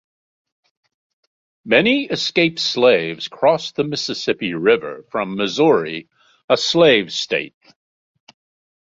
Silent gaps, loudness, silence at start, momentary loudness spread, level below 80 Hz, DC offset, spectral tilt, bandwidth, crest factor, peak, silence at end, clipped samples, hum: 6.44-6.48 s; -17 LUFS; 1.65 s; 11 LU; -62 dBFS; under 0.1%; -4 dB/octave; 7.8 kHz; 18 dB; 0 dBFS; 1.35 s; under 0.1%; none